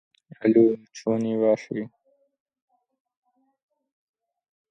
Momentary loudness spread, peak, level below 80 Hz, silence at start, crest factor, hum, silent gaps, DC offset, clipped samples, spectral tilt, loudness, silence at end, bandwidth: 15 LU; -6 dBFS; -76 dBFS; 0.4 s; 20 dB; none; none; under 0.1%; under 0.1%; -7.5 dB/octave; -23 LUFS; 2.85 s; 7.6 kHz